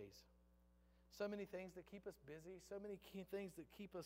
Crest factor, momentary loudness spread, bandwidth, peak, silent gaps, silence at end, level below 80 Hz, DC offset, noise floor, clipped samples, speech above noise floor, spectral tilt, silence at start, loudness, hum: 18 dB; 10 LU; 16 kHz; -36 dBFS; none; 0 s; -76 dBFS; under 0.1%; -74 dBFS; under 0.1%; 21 dB; -5.5 dB/octave; 0 s; -54 LUFS; 60 Hz at -75 dBFS